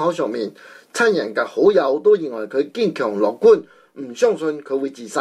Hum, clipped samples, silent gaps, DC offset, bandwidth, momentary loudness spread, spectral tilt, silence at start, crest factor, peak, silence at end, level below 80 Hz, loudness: none; under 0.1%; none; under 0.1%; 12 kHz; 11 LU; -5 dB/octave; 0 s; 16 dB; -4 dBFS; 0 s; -66 dBFS; -19 LUFS